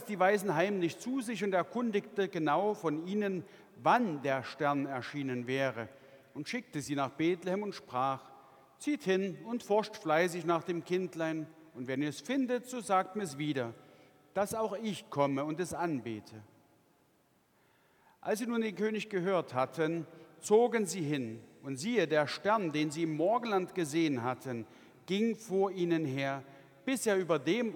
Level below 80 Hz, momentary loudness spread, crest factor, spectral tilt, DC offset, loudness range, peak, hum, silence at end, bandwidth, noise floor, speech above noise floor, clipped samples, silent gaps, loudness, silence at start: -80 dBFS; 11 LU; 20 dB; -5.5 dB/octave; under 0.1%; 5 LU; -14 dBFS; none; 0 s; 19 kHz; -70 dBFS; 37 dB; under 0.1%; none; -33 LUFS; 0 s